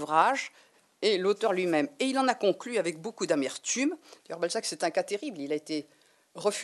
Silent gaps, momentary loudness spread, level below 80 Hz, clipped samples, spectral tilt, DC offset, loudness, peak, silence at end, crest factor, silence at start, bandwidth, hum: none; 9 LU; -86 dBFS; under 0.1%; -3 dB/octave; under 0.1%; -29 LUFS; -8 dBFS; 0 s; 22 dB; 0 s; 12 kHz; none